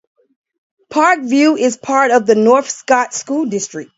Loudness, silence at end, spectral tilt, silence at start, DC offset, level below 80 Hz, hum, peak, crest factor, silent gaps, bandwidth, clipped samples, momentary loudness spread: -14 LUFS; 0.15 s; -3.5 dB/octave; 0.9 s; under 0.1%; -64 dBFS; none; 0 dBFS; 14 dB; none; 8 kHz; under 0.1%; 8 LU